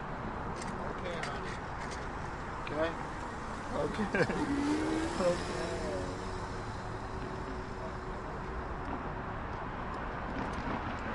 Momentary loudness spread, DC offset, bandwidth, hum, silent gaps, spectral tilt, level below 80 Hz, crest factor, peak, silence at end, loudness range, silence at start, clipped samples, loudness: 9 LU; under 0.1%; 11.5 kHz; none; none; -5.5 dB/octave; -46 dBFS; 20 dB; -16 dBFS; 0 s; 6 LU; 0 s; under 0.1%; -37 LUFS